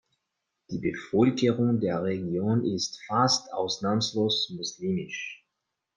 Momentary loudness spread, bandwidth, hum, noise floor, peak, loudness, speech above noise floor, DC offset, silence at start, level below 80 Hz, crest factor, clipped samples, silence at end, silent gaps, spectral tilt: 9 LU; 10 kHz; none; -83 dBFS; -10 dBFS; -27 LUFS; 56 dB; under 0.1%; 0.7 s; -66 dBFS; 18 dB; under 0.1%; 0.6 s; none; -5 dB/octave